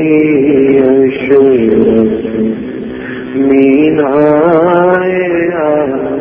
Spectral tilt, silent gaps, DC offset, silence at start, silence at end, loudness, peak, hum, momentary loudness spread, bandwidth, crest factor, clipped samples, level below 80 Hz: -10.5 dB/octave; none; under 0.1%; 0 s; 0 s; -9 LUFS; 0 dBFS; none; 9 LU; 3.7 kHz; 8 dB; 0.2%; -42 dBFS